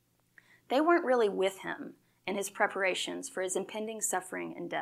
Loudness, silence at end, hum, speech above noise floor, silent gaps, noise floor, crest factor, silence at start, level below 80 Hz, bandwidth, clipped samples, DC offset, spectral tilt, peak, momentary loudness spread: -32 LUFS; 0 s; none; 33 dB; none; -65 dBFS; 20 dB; 0.7 s; -86 dBFS; 15.5 kHz; under 0.1%; under 0.1%; -2.5 dB/octave; -12 dBFS; 13 LU